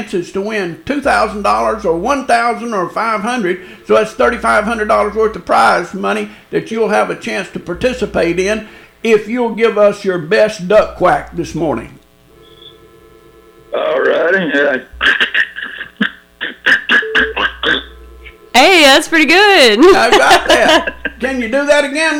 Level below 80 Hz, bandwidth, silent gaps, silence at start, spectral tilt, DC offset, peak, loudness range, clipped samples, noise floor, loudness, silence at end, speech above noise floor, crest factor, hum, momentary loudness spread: -40 dBFS; 18 kHz; none; 0 s; -3.5 dB/octave; under 0.1%; 0 dBFS; 9 LU; under 0.1%; -45 dBFS; -12 LUFS; 0 s; 32 dB; 12 dB; none; 13 LU